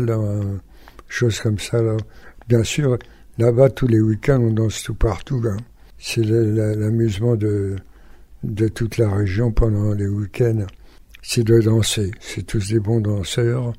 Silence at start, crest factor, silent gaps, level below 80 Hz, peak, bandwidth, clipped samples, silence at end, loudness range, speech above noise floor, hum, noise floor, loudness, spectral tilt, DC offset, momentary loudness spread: 0 s; 18 dB; none; -34 dBFS; -2 dBFS; 15 kHz; under 0.1%; 0 s; 3 LU; 24 dB; none; -43 dBFS; -20 LUFS; -6.5 dB/octave; under 0.1%; 12 LU